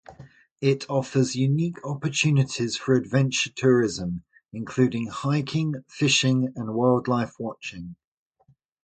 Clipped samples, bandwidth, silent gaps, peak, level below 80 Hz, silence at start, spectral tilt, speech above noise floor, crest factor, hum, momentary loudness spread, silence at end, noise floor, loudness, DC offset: under 0.1%; 9.2 kHz; 0.51-0.56 s; -6 dBFS; -58 dBFS; 0.1 s; -5.5 dB/octave; 40 dB; 18 dB; none; 12 LU; 0.9 s; -64 dBFS; -24 LUFS; under 0.1%